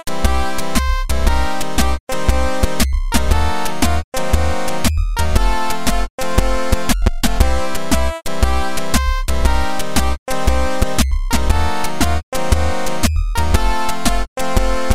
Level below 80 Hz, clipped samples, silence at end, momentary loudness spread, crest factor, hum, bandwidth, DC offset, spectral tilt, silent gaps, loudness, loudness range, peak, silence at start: -20 dBFS; under 0.1%; 0 s; 3 LU; 16 dB; none; 16 kHz; 10%; -4.5 dB/octave; 2.00-2.07 s, 4.04-4.12 s, 6.10-6.18 s, 10.19-10.26 s, 12.23-12.32 s, 14.28-14.36 s; -19 LUFS; 0 LU; 0 dBFS; 0 s